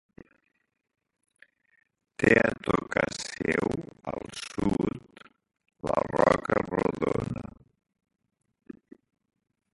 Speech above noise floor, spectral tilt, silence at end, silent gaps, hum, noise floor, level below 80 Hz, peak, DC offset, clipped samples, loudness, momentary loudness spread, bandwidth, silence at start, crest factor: 30 dB; -5.5 dB/octave; 1 s; none; none; -55 dBFS; -54 dBFS; -6 dBFS; under 0.1%; under 0.1%; -28 LUFS; 15 LU; 11.5 kHz; 2.2 s; 26 dB